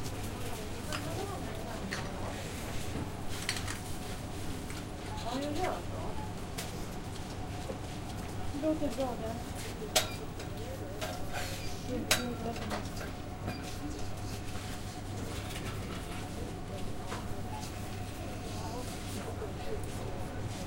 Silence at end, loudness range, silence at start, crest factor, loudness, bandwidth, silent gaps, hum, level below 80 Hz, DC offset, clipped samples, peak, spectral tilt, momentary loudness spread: 0 s; 5 LU; 0 s; 26 dB; -38 LUFS; 16.5 kHz; none; none; -46 dBFS; under 0.1%; under 0.1%; -10 dBFS; -4.5 dB/octave; 7 LU